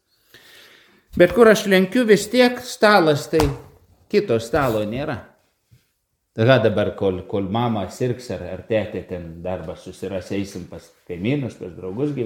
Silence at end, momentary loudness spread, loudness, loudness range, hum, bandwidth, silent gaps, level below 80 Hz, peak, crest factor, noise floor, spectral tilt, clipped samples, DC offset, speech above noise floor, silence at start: 0 s; 17 LU; -20 LUFS; 11 LU; none; 19 kHz; none; -46 dBFS; 0 dBFS; 20 dB; -71 dBFS; -5.5 dB/octave; under 0.1%; under 0.1%; 51 dB; 1.15 s